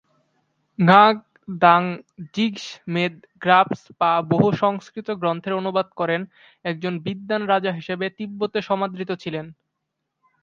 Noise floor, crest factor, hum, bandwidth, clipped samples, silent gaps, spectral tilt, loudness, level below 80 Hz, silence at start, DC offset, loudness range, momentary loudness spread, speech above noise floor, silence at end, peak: -79 dBFS; 22 dB; none; 7.4 kHz; under 0.1%; none; -7 dB/octave; -21 LUFS; -66 dBFS; 0.8 s; under 0.1%; 6 LU; 15 LU; 58 dB; 0.9 s; 0 dBFS